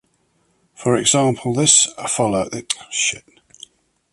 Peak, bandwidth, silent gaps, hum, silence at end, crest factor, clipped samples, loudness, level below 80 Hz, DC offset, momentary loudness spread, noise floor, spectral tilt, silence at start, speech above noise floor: 0 dBFS; 11.5 kHz; none; none; 0.95 s; 20 dB; under 0.1%; -17 LUFS; -54 dBFS; under 0.1%; 12 LU; -63 dBFS; -2.5 dB/octave; 0.8 s; 45 dB